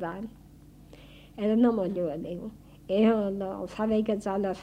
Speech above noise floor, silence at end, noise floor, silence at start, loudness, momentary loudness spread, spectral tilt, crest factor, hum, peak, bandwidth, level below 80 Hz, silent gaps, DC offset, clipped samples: 24 dB; 0 s; -51 dBFS; 0 s; -28 LUFS; 16 LU; -7.5 dB/octave; 16 dB; none; -12 dBFS; 9.6 kHz; -56 dBFS; none; under 0.1%; under 0.1%